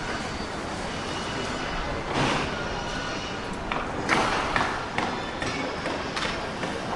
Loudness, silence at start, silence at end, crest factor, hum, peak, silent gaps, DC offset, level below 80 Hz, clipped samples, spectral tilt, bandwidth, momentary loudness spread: -28 LUFS; 0 s; 0 s; 24 dB; none; -6 dBFS; none; under 0.1%; -42 dBFS; under 0.1%; -4 dB/octave; 11.5 kHz; 7 LU